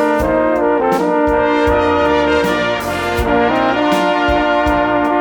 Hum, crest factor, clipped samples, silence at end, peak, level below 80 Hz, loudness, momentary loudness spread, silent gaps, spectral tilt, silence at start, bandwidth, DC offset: none; 12 dB; under 0.1%; 0 s; 0 dBFS; -30 dBFS; -14 LUFS; 2 LU; none; -5.5 dB/octave; 0 s; over 20 kHz; under 0.1%